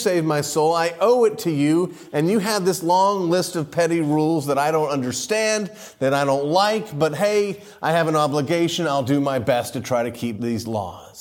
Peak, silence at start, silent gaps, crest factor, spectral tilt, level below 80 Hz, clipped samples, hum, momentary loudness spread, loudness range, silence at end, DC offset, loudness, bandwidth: -6 dBFS; 0 s; none; 14 dB; -5 dB/octave; -62 dBFS; under 0.1%; none; 7 LU; 2 LU; 0 s; under 0.1%; -21 LUFS; 17 kHz